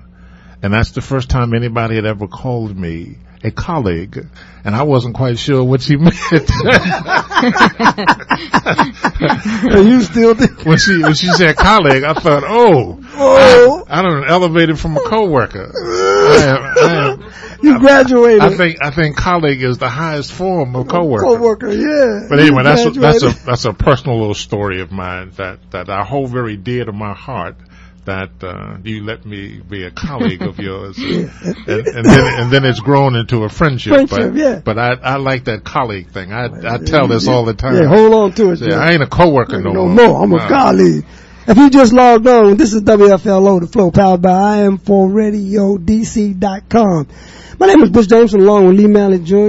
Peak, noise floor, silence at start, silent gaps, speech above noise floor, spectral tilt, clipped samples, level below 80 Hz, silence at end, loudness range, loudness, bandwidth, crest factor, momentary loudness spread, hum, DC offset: 0 dBFS; -38 dBFS; 0.65 s; none; 28 dB; -6 dB/octave; 0.3%; -32 dBFS; 0 s; 12 LU; -11 LUFS; 10.5 kHz; 10 dB; 16 LU; none; under 0.1%